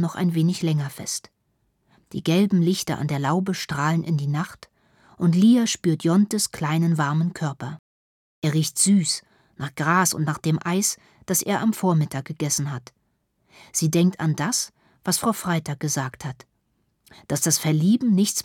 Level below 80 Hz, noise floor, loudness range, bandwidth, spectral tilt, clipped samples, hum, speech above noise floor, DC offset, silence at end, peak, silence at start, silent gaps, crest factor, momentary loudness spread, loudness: -64 dBFS; -70 dBFS; 3 LU; 18.5 kHz; -4.5 dB/octave; under 0.1%; none; 48 dB; under 0.1%; 0 s; -6 dBFS; 0 s; 7.79-8.42 s; 18 dB; 12 LU; -22 LUFS